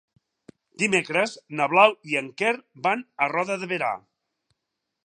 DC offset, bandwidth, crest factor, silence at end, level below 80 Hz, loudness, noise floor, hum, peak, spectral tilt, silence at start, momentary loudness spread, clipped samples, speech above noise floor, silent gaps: under 0.1%; 11 kHz; 22 dB; 1.1 s; -78 dBFS; -23 LUFS; -82 dBFS; none; -4 dBFS; -4 dB/octave; 0.8 s; 10 LU; under 0.1%; 58 dB; none